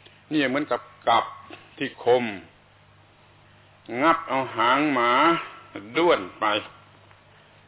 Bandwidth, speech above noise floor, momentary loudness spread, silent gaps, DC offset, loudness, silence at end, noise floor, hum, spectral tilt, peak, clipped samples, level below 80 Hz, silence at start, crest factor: 4 kHz; 32 dB; 17 LU; none; under 0.1%; -23 LUFS; 1 s; -55 dBFS; none; -8 dB/octave; -8 dBFS; under 0.1%; -64 dBFS; 0.3 s; 18 dB